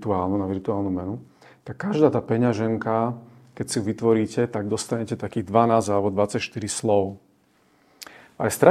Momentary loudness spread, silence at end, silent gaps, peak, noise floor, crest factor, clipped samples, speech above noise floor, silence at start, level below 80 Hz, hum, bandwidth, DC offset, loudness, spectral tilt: 16 LU; 0 s; none; 0 dBFS; -61 dBFS; 24 dB; under 0.1%; 39 dB; 0 s; -62 dBFS; none; 15.5 kHz; under 0.1%; -24 LUFS; -6 dB/octave